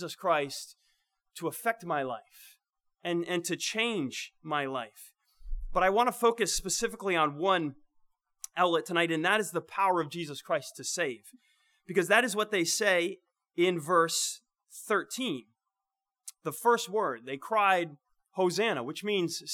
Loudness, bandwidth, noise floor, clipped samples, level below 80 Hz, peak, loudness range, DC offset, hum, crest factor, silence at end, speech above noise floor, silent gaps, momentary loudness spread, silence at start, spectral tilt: -30 LUFS; 19 kHz; -90 dBFS; under 0.1%; -52 dBFS; -8 dBFS; 6 LU; under 0.1%; none; 22 dB; 0 s; 60 dB; none; 15 LU; 0 s; -3 dB/octave